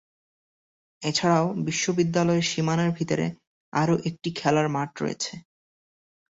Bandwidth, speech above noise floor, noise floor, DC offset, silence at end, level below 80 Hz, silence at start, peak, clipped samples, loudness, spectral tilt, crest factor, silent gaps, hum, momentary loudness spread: 8 kHz; over 66 dB; under -90 dBFS; under 0.1%; 0.9 s; -62 dBFS; 1 s; -8 dBFS; under 0.1%; -25 LUFS; -5 dB/octave; 18 dB; 3.47-3.72 s; none; 9 LU